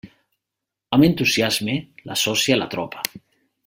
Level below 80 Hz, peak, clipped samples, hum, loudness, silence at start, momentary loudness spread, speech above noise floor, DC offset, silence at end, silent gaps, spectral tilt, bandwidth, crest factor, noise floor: -54 dBFS; 0 dBFS; under 0.1%; none; -20 LUFS; 0.05 s; 11 LU; 64 dB; under 0.1%; 0.5 s; none; -4 dB/octave; 16.5 kHz; 22 dB; -84 dBFS